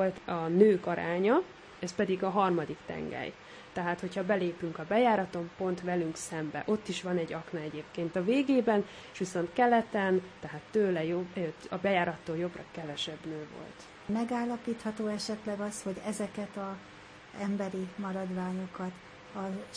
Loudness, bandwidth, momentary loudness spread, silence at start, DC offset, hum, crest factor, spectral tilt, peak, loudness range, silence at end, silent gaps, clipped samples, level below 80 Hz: -32 LUFS; 10.5 kHz; 14 LU; 0 s; under 0.1%; none; 22 dB; -6 dB/octave; -10 dBFS; 7 LU; 0 s; none; under 0.1%; -66 dBFS